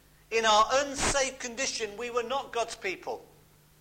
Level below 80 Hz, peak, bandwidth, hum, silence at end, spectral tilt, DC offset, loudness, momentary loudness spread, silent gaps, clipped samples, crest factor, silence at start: -50 dBFS; -12 dBFS; 16.5 kHz; 50 Hz at -60 dBFS; 0.55 s; -1.5 dB/octave; under 0.1%; -28 LUFS; 12 LU; none; under 0.1%; 18 dB; 0.3 s